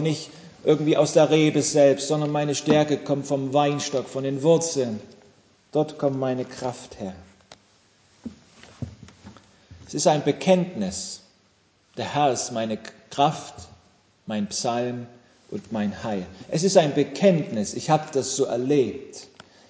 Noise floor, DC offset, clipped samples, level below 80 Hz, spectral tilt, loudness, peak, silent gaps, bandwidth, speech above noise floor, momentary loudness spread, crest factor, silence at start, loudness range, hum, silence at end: -62 dBFS; under 0.1%; under 0.1%; -60 dBFS; -5 dB/octave; -23 LUFS; -2 dBFS; none; 8 kHz; 39 dB; 19 LU; 22 dB; 0 s; 10 LU; none; 0.45 s